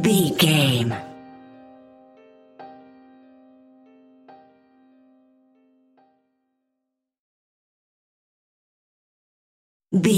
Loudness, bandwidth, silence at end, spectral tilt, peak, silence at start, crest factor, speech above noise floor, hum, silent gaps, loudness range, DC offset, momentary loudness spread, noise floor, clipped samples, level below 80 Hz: -20 LUFS; 16 kHz; 0 s; -5 dB/octave; -4 dBFS; 0 s; 24 dB; 62 dB; none; 7.20-9.80 s; 28 LU; under 0.1%; 28 LU; -81 dBFS; under 0.1%; -66 dBFS